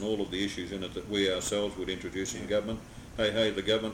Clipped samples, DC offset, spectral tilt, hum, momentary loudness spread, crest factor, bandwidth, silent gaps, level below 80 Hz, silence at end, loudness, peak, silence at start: under 0.1%; under 0.1%; -3.5 dB/octave; none; 9 LU; 16 dB; 16.5 kHz; none; -52 dBFS; 0 s; -31 LUFS; -16 dBFS; 0 s